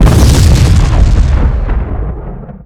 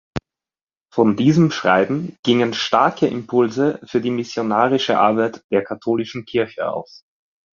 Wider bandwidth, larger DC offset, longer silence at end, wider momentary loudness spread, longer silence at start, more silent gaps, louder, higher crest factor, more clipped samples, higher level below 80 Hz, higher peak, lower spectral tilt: first, 15.5 kHz vs 7.4 kHz; neither; second, 0 s vs 0.75 s; first, 14 LU vs 8 LU; second, 0 s vs 0.15 s; second, none vs 0.63-0.67 s, 2.19-2.23 s, 5.44-5.49 s; first, -10 LUFS vs -19 LUFS; second, 8 dB vs 18 dB; first, 4% vs under 0.1%; first, -10 dBFS vs -56 dBFS; about the same, 0 dBFS vs -2 dBFS; about the same, -6 dB/octave vs -6 dB/octave